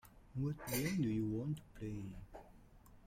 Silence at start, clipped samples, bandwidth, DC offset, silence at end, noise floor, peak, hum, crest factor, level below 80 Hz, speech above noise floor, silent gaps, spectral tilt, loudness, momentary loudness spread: 0.05 s; under 0.1%; 16.5 kHz; under 0.1%; 0 s; -62 dBFS; -26 dBFS; none; 16 dB; -60 dBFS; 21 dB; none; -6 dB/octave; -41 LUFS; 17 LU